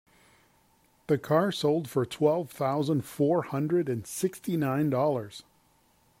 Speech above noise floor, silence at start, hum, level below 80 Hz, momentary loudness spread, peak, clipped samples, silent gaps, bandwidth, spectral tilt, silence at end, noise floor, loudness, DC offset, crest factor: 38 dB; 1.1 s; none; -68 dBFS; 6 LU; -10 dBFS; under 0.1%; none; 16 kHz; -6.5 dB/octave; 0.8 s; -65 dBFS; -28 LUFS; under 0.1%; 18 dB